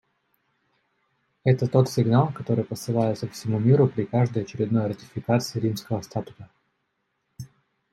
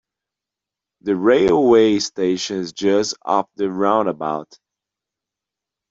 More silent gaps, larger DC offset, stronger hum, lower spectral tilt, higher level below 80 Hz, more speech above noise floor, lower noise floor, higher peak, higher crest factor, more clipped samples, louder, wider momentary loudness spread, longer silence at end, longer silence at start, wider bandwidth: neither; neither; neither; first, -7.5 dB/octave vs -4.5 dB/octave; second, -64 dBFS vs -56 dBFS; second, 52 dB vs 69 dB; second, -75 dBFS vs -86 dBFS; second, -6 dBFS vs -2 dBFS; about the same, 20 dB vs 16 dB; neither; second, -24 LUFS vs -18 LUFS; about the same, 13 LU vs 11 LU; second, 0.45 s vs 1.45 s; first, 1.45 s vs 1.05 s; first, 14 kHz vs 7.8 kHz